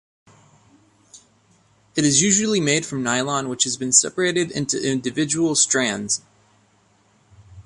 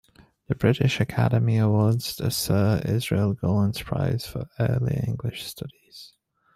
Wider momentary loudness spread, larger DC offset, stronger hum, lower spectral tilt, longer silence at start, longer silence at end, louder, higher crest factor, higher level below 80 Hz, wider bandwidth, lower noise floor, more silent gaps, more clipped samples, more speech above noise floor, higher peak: second, 8 LU vs 13 LU; neither; neither; second, -2.5 dB/octave vs -6.5 dB/octave; first, 1.15 s vs 0.5 s; second, 0.05 s vs 0.5 s; first, -19 LUFS vs -24 LUFS; about the same, 22 dB vs 18 dB; second, -60 dBFS vs -50 dBFS; second, 11.5 kHz vs 15.5 kHz; about the same, -59 dBFS vs -58 dBFS; neither; neither; first, 39 dB vs 35 dB; first, -2 dBFS vs -6 dBFS